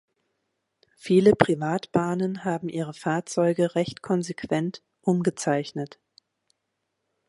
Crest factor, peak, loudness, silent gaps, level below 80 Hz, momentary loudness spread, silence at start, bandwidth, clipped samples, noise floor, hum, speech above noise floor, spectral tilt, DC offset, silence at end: 26 dB; 0 dBFS; -25 LUFS; none; -62 dBFS; 12 LU; 1.05 s; 11.5 kHz; under 0.1%; -79 dBFS; none; 55 dB; -6.5 dB/octave; under 0.1%; 1.4 s